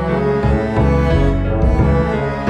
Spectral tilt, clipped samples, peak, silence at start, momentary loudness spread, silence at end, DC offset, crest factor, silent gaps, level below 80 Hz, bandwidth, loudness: -9 dB/octave; under 0.1%; -2 dBFS; 0 s; 3 LU; 0 s; under 0.1%; 12 dB; none; -20 dBFS; 8.8 kHz; -16 LUFS